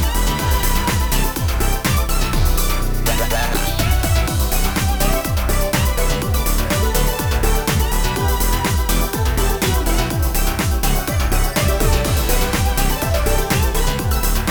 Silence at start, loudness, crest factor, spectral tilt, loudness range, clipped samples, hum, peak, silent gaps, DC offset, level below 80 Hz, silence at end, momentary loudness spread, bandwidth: 0 s; -18 LUFS; 14 dB; -4 dB/octave; 1 LU; under 0.1%; none; -2 dBFS; none; 0.3%; -18 dBFS; 0 s; 2 LU; over 20 kHz